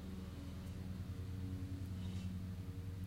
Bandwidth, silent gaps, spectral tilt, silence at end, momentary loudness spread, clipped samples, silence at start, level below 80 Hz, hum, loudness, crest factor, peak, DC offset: 16 kHz; none; -7 dB/octave; 0 s; 4 LU; under 0.1%; 0 s; -56 dBFS; none; -47 LUFS; 12 dB; -34 dBFS; under 0.1%